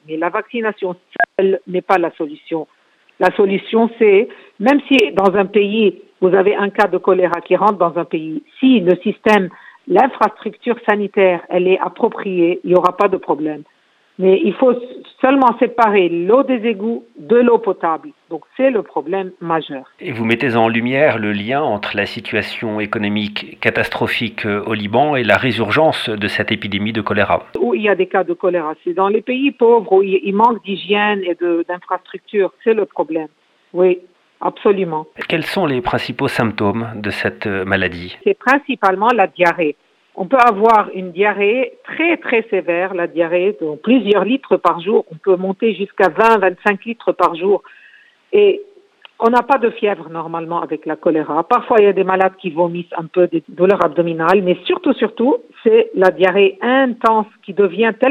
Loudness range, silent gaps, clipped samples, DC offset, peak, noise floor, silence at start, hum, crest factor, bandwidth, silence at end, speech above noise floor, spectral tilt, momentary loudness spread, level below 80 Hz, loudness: 4 LU; none; under 0.1%; under 0.1%; 0 dBFS; -48 dBFS; 0.1 s; none; 16 dB; 12.5 kHz; 0 s; 32 dB; -7 dB/octave; 9 LU; -56 dBFS; -16 LUFS